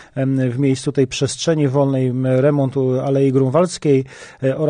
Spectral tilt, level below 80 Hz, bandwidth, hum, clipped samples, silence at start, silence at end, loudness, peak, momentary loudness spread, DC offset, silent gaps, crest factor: -6.5 dB/octave; -54 dBFS; 10 kHz; none; under 0.1%; 0 s; 0 s; -17 LUFS; -4 dBFS; 4 LU; under 0.1%; none; 14 dB